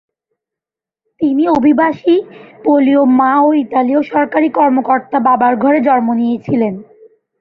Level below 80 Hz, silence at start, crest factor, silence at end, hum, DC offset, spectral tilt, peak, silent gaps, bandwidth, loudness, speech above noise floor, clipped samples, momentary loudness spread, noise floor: -56 dBFS; 1.2 s; 12 dB; 0.6 s; none; under 0.1%; -8.5 dB/octave; 0 dBFS; none; 5.2 kHz; -12 LUFS; 75 dB; under 0.1%; 6 LU; -87 dBFS